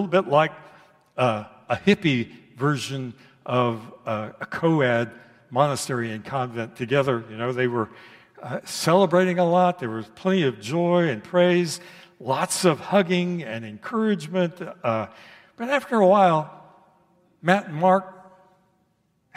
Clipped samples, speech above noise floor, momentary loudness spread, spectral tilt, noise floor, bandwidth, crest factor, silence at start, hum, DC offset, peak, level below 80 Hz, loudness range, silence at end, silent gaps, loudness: under 0.1%; 45 dB; 14 LU; -5.5 dB/octave; -68 dBFS; 15.5 kHz; 22 dB; 0 s; none; under 0.1%; -2 dBFS; -68 dBFS; 4 LU; 1.15 s; none; -23 LUFS